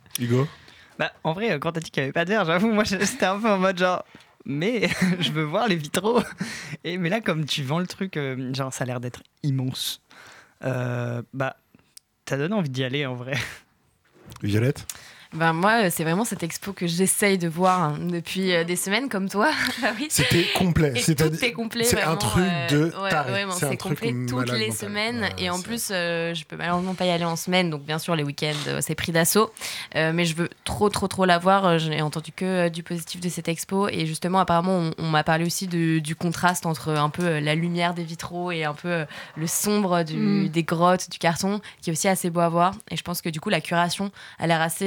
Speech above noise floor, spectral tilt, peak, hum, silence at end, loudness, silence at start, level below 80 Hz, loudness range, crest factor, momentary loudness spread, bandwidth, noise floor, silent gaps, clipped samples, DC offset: 40 dB; -4.5 dB/octave; -4 dBFS; none; 0 s; -24 LUFS; 0.15 s; -52 dBFS; 6 LU; 20 dB; 9 LU; 19.5 kHz; -64 dBFS; none; under 0.1%; under 0.1%